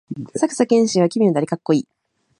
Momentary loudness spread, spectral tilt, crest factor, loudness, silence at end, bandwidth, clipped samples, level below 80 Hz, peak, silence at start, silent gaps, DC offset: 8 LU; -6 dB/octave; 16 dB; -18 LUFS; 0.55 s; 11 kHz; under 0.1%; -66 dBFS; -2 dBFS; 0.1 s; none; under 0.1%